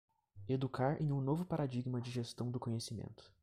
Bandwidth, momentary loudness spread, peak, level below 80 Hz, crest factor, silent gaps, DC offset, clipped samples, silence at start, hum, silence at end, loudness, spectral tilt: 14 kHz; 10 LU; -22 dBFS; -66 dBFS; 16 dB; none; under 0.1%; under 0.1%; 0.35 s; none; 0.15 s; -39 LUFS; -7 dB/octave